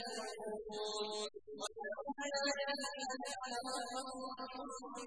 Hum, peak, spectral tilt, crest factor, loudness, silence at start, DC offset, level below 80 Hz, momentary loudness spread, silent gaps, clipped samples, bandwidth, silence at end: none; -26 dBFS; -1 dB/octave; 18 dB; -42 LUFS; 0 s; under 0.1%; -76 dBFS; 9 LU; none; under 0.1%; 11 kHz; 0 s